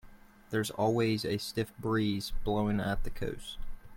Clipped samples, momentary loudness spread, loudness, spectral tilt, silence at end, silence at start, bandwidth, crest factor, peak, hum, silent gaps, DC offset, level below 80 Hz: under 0.1%; 9 LU; -33 LUFS; -5.5 dB/octave; 0 s; 0.05 s; 16.5 kHz; 14 dB; -18 dBFS; none; none; under 0.1%; -42 dBFS